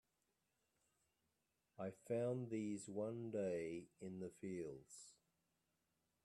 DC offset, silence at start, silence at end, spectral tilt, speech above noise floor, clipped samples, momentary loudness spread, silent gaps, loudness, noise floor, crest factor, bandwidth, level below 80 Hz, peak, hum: under 0.1%; 1.8 s; 1.1 s; -7 dB/octave; 41 dB; under 0.1%; 12 LU; none; -47 LUFS; -88 dBFS; 16 dB; 12.5 kHz; -86 dBFS; -34 dBFS; none